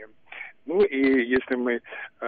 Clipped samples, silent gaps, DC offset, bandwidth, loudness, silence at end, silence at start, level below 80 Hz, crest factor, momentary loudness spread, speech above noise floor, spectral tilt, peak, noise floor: under 0.1%; none; under 0.1%; 4.8 kHz; -24 LUFS; 0 s; 0 s; -60 dBFS; 16 dB; 19 LU; 19 dB; -3.5 dB/octave; -10 dBFS; -43 dBFS